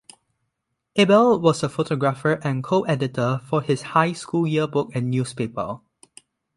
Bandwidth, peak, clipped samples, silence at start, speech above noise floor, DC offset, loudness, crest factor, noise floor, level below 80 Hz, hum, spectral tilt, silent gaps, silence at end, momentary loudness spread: 11.5 kHz; -4 dBFS; under 0.1%; 0.95 s; 57 dB; under 0.1%; -22 LUFS; 20 dB; -78 dBFS; -60 dBFS; none; -6.5 dB/octave; none; 0.8 s; 11 LU